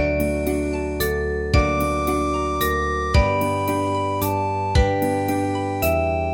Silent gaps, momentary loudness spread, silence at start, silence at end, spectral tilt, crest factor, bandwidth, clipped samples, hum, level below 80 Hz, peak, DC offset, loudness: none; 4 LU; 0 s; 0 s; -6 dB/octave; 18 dB; 17.5 kHz; under 0.1%; none; -28 dBFS; -4 dBFS; under 0.1%; -21 LUFS